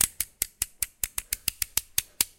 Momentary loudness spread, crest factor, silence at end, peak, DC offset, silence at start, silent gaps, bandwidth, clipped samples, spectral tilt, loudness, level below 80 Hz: 4 LU; 26 dB; 0.15 s; -4 dBFS; under 0.1%; 0 s; none; 17.5 kHz; under 0.1%; 1 dB/octave; -29 LUFS; -50 dBFS